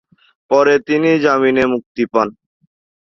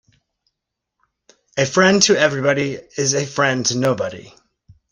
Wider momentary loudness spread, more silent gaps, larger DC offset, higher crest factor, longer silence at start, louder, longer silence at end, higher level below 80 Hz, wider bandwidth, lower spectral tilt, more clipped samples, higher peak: second, 6 LU vs 12 LU; first, 1.86-1.95 s vs none; neither; second, 14 dB vs 20 dB; second, 0.5 s vs 1.55 s; about the same, -15 LUFS vs -17 LUFS; first, 0.85 s vs 0.65 s; about the same, -54 dBFS vs -58 dBFS; second, 7.2 kHz vs 13 kHz; first, -6 dB/octave vs -3.5 dB/octave; neither; about the same, -2 dBFS vs 0 dBFS